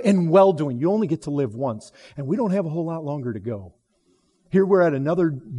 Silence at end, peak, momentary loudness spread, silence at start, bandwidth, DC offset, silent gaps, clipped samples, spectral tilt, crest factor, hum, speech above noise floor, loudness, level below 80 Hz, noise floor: 0 s; -4 dBFS; 15 LU; 0 s; 11.5 kHz; under 0.1%; none; under 0.1%; -8.5 dB/octave; 16 dB; none; 44 dB; -22 LUFS; -62 dBFS; -65 dBFS